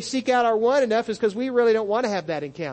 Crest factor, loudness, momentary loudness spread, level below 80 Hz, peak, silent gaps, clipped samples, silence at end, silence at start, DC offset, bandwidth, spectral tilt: 14 dB; -22 LUFS; 7 LU; -64 dBFS; -8 dBFS; none; under 0.1%; 0 s; 0 s; under 0.1%; 8.8 kHz; -4.5 dB/octave